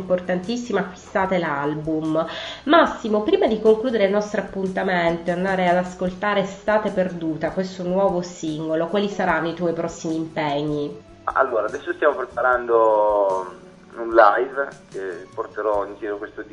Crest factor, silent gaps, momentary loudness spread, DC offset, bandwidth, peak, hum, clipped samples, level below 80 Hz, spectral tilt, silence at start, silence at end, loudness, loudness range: 22 dB; none; 12 LU; under 0.1%; 10.5 kHz; 0 dBFS; none; under 0.1%; -52 dBFS; -6 dB/octave; 0 s; 0.05 s; -22 LUFS; 4 LU